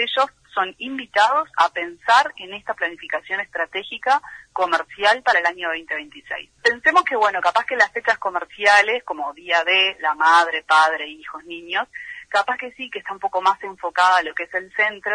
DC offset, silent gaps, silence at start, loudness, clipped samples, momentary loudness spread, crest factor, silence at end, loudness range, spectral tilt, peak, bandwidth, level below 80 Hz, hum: under 0.1%; none; 0 s; -19 LUFS; under 0.1%; 14 LU; 18 dB; 0 s; 4 LU; -1 dB/octave; -2 dBFS; 10.5 kHz; -64 dBFS; none